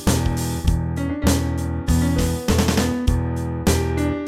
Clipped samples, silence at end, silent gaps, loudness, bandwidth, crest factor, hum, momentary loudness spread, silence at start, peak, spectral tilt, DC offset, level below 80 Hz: under 0.1%; 0 s; none; -21 LUFS; 16 kHz; 16 dB; none; 5 LU; 0 s; -4 dBFS; -5.5 dB/octave; 0.1%; -26 dBFS